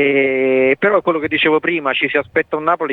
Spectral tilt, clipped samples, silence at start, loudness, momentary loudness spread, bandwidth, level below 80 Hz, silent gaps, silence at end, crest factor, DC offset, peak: -7 dB/octave; under 0.1%; 0 s; -15 LUFS; 4 LU; 4.2 kHz; -58 dBFS; none; 0 s; 14 dB; under 0.1%; -2 dBFS